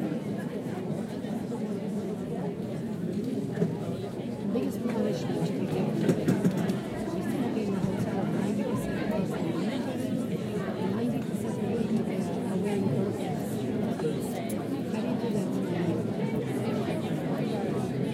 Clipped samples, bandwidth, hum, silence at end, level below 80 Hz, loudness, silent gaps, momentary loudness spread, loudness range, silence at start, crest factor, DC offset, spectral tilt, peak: under 0.1%; 16 kHz; none; 0 s; -60 dBFS; -30 LUFS; none; 5 LU; 4 LU; 0 s; 20 dB; under 0.1%; -7.5 dB/octave; -10 dBFS